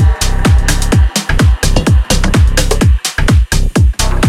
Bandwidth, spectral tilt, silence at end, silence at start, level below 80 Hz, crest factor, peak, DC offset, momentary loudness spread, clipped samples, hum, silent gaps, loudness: 15.5 kHz; -4.5 dB/octave; 0 s; 0 s; -12 dBFS; 10 dB; 0 dBFS; under 0.1%; 2 LU; under 0.1%; none; none; -12 LUFS